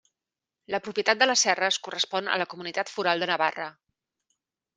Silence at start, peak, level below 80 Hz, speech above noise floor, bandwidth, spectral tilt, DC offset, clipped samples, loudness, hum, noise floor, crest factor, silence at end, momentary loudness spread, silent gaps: 0.7 s; -4 dBFS; -80 dBFS; 63 dB; 10 kHz; -1 dB/octave; under 0.1%; under 0.1%; -25 LUFS; none; -89 dBFS; 24 dB; 1.05 s; 12 LU; none